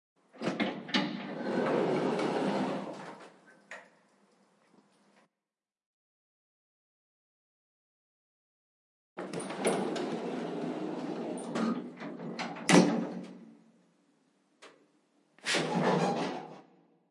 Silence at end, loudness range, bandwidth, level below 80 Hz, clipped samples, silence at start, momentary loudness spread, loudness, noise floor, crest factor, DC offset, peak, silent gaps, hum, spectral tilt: 0.5 s; 9 LU; 12 kHz; -86 dBFS; under 0.1%; 0.35 s; 18 LU; -32 LUFS; under -90 dBFS; 28 dB; under 0.1%; -6 dBFS; 5.86-9.16 s; none; -5 dB/octave